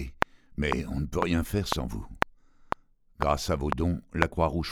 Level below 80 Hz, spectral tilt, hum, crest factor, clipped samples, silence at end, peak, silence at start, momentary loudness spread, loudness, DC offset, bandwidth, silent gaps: -40 dBFS; -5.5 dB/octave; none; 30 dB; under 0.1%; 0 s; 0 dBFS; 0 s; 10 LU; -30 LUFS; under 0.1%; over 20 kHz; none